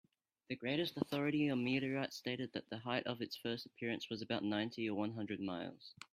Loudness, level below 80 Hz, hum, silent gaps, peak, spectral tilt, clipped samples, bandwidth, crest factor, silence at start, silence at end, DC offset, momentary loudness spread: -40 LUFS; -80 dBFS; none; none; -18 dBFS; -6 dB/octave; under 0.1%; 15.5 kHz; 22 dB; 0.5 s; 0.05 s; under 0.1%; 8 LU